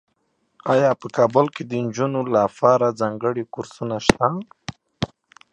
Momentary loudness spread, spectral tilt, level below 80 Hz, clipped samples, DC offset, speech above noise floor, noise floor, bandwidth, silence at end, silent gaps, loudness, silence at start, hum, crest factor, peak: 14 LU; -6 dB/octave; -48 dBFS; under 0.1%; under 0.1%; 49 dB; -69 dBFS; 11.5 kHz; 0.45 s; none; -21 LUFS; 0.65 s; none; 22 dB; 0 dBFS